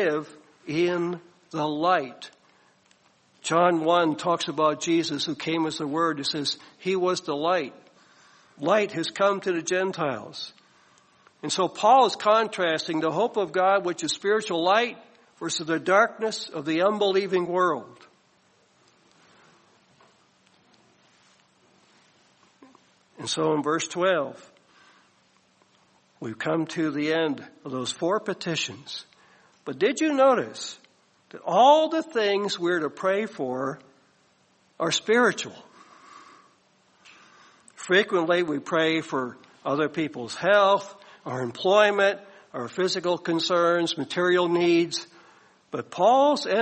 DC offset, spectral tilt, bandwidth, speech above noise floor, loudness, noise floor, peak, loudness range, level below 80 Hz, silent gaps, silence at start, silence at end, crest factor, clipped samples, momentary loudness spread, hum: under 0.1%; -4 dB/octave; 8.8 kHz; 39 dB; -24 LUFS; -64 dBFS; -6 dBFS; 6 LU; -74 dBFS; none; 0 s; 0 s; 20 dB; under 0.1%; 16 LU; none